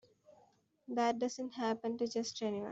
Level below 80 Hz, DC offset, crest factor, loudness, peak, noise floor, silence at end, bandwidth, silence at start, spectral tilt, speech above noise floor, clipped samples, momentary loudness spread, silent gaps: -82 dBFS; under 0.1%; 18 dB; -37 LUFS; -20 dBFS; -70 dBFS; 0 s; 8 kHz; 0.3 s; -4 dB/octave; 33 dB; under 0.1%; 5 LU; none